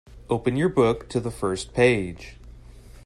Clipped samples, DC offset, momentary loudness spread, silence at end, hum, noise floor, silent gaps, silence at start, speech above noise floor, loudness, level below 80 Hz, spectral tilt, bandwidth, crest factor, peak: under 0.1%; under 0.1%; 13 LU; 0.05 s; none; -45 dBFS; none; 0.1 s; 22 dB; -23 LUFS; -46 dBFS; -6 dB/octave; 12.5 kHz; 18 dB; -6 dBFS